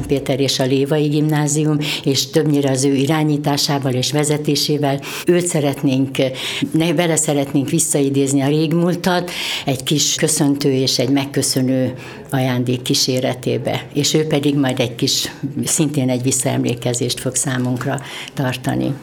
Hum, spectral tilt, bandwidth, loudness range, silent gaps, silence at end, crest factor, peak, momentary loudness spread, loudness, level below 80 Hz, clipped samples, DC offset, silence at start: none; -4.5 dB/octave; 19 kHz; 2 LU; none; 0 s; 16 dB; 0 dBFS; 5 LU; -17 LUFS; -52 dBFS; under 0.1%; under 0.1%; 0 s